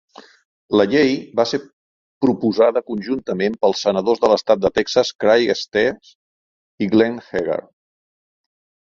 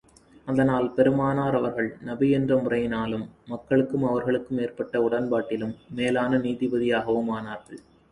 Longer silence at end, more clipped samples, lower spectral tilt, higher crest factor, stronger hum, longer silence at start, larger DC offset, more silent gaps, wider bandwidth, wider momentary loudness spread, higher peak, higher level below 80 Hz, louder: first, 1.4 s vs 0.35 s; neither; second, -5 dB/octave vs -8 dB/octave; about the same, 18 dB vs 18 dB; neither; first, 0.7 s vs 0.45 s; neither; first, 1.73-2.21 s, 5.15-5.19 s, 6.15-6.78 s vs none; second, 7.6 kHz vs 11 kHz; about the same, 8 LU vs 10 LU; first, -2 dBFS vs -8 dBFS; about the same, -56 dBFS vs -56 dBFS; first, -18 LUFS vs -25 LUFS